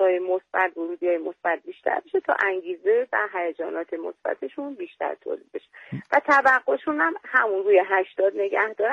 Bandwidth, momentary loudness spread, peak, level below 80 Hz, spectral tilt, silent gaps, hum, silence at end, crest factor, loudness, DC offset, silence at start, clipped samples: 7.6 kHz; 14 LU; -6 dBFS; -74 dBFS; -6 dB/octave; none; none; 0 s; 18 dB; -24 LUFS; under 0.1%; 0 s; under 0.1%